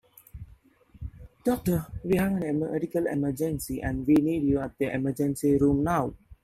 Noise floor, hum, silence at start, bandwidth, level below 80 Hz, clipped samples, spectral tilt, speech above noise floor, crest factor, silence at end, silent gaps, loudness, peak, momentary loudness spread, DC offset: -56 dBFS; none; 0.35 s; 15.5 kHz; -46 dBFS; under 0.1%; -7.5 dB/octave; 30 dB; 16 dB; 0.1 s; none; -27 LUFS; -12 dBFS; 20 LU; under 0.1%